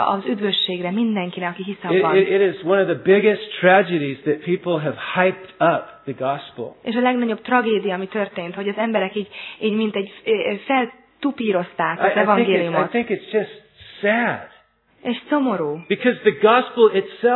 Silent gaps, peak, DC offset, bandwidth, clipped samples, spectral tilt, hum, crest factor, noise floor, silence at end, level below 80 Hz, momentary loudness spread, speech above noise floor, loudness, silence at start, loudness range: none; 0 dBFS; under 0.1%; 4.2 kHz; under 0.1%; -9 dB/octave; none; 20 dB; -54 dBFS; 0 s; -68 dBFS; 11 LU; 35 dB; -20 LUFS; 0 s; 5 LU